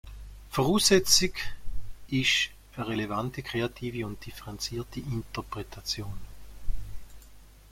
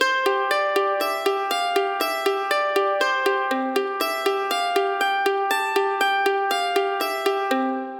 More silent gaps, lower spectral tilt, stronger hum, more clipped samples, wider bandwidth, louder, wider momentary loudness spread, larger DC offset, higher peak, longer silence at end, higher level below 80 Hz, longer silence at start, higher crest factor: neither; first, -3 dB/octave vs -0.5 dB/octave; neither; neither; second, 16.5 kHz vs over 20 kHz; second, -28 LUFS vs -22 LUFS; first, 24 LU vs 3 LU; neither; about the same, -6 dBFS vs -4 dBFS; first, 0.2 s vs 0 s; first, -42 dBFS vs -78 dBFS; about the same, 0.05 s vs 0 s; first, 24 dB vs 18 dB